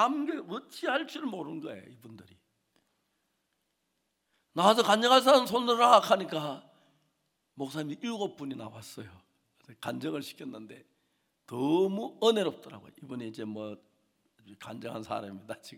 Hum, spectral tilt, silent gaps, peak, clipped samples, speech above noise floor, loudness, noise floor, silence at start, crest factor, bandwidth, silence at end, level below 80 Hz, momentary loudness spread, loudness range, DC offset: none; -4 dB/octave; none; -8 dBFS; under 0.1%; 50 dB; -28 LUFS; -80 dBFS; 0 s; 24 dB; 18 kHz; 0 s; -80 dBFS; 23 LU; 17 LU; under 0.1%